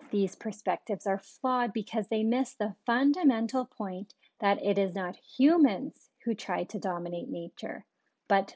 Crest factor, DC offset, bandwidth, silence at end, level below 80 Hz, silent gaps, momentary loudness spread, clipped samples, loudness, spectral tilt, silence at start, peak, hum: 18 dB; under 0.1%; 8 kHz; 0 s; -86 dBFS; none; 13 LU; under 0.1%; -30 LUFS; -6 dB/octave; 0 s; -12 dBFS; none